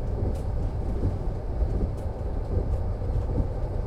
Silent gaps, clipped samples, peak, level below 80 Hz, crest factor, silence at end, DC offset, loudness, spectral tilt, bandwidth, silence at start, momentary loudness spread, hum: none; under 0.1%; -12 dBFS; -30 dBFS; 16 dB; 0 s; under 0.1%; -30 LUFS; -9.5 dB/octave; 8.8 kHz; 0 s; 4 LU; none